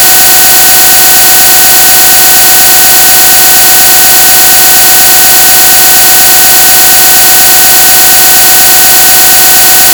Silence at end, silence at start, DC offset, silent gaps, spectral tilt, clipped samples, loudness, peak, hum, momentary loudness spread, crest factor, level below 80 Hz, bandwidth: 0 s; 0 s; 0.7%; none; 1 dB/octave; 100%; 3 LUFS; 0 dBFS; none; 0 LU; 0 dB; -32 dBFS; over 20 kHz